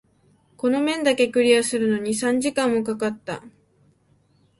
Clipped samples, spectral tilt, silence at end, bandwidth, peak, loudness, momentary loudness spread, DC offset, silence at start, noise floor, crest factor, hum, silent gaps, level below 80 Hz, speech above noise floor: under 0.1%; -3.5 dB/octave; 1.1 s; 11.5 kHz; -4 dBFS; -21 LUFS; 9 LU; under 0.1%; 0.65 s; -61 dBFS; 18 dB; none; none; -64 dBFS; 40 dB